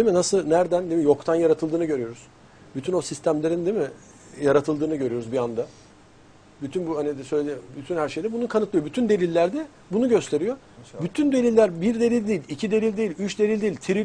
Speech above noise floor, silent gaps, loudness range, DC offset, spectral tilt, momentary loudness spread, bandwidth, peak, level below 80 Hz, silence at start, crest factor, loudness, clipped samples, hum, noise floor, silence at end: 28 dB; none; 6 LU; under 0.1%; -6 dB/octave; 11 LU; 10.5 kHz; -6 dBFS; -58 dBFS; 0 s; 18 dB; -24 LUFS; under 0.1%; none; -51 dBFS; 0 s